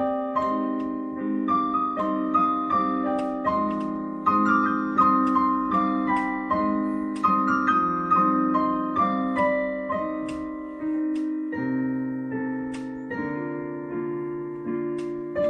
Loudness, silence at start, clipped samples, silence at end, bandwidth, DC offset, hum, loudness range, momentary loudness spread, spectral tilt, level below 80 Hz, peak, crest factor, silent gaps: -25 LUFS; 0 s; under 0.1%; 0 s; 9.4 kHz; under 0.1%; none; 7 LU; 10 LU; -8 dB/octave; -56 dBFS; -8 dBFS; 16 dB; none